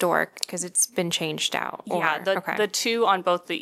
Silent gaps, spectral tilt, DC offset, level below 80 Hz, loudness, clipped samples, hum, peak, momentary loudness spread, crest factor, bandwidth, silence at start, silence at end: none; -2 dB/octave; under 0.1%; -74 dBFS; -24 LUFS; under 0.1%; none; -2 dBFS; 6 LU; 22 dB; 16.5 kHz; 0 s; 0 s